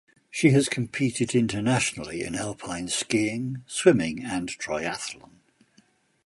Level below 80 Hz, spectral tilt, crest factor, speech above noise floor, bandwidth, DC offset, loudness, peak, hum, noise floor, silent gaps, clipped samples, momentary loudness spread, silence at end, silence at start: -58 dBFS; -4.5 dB/octave; 22 dB; 38 dB; 11.5 kHz; under 0.1%; -26 LUFS; -4 dBFS; none; -63 dBFS; none; under 0.1%; 12 LU; 1.1 s; 0.35 s